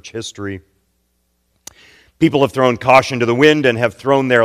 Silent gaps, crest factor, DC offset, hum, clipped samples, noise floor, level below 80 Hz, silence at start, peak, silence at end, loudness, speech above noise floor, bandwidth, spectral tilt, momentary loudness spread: none; 16 dB; under 0.1%; none; 0.2%; -65 dBFS; -52 dBFS; 0.05 s; 0 dBFS; 0 s; -14 LUFS; 51 dB; 15 kHz; -5.5 dB/octave; 17 LU